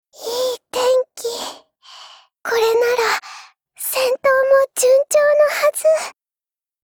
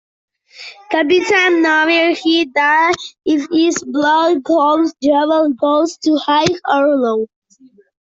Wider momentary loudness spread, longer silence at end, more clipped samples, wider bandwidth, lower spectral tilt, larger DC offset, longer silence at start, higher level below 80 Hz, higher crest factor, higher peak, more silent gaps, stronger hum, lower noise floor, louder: first, 13 LU vs 7 LU; about the same, 0.7 s vs 0.8 s; neither; first, over 20 kHz vs 7.8 kHz; second, 0.5 dB/octave vs -3.5 dB/octave; neither; second, 0.2 s vs 0.6 s; about the same, -64 dBFS vs -60 dBFS; about the same, 14 dB vs 14 dB; about the same, -4 dBFS vs -2 dBFS; neither; neither; first, under -90 dBFS vs -49 dBFS; second, -17 LUFS vs -14 LUFS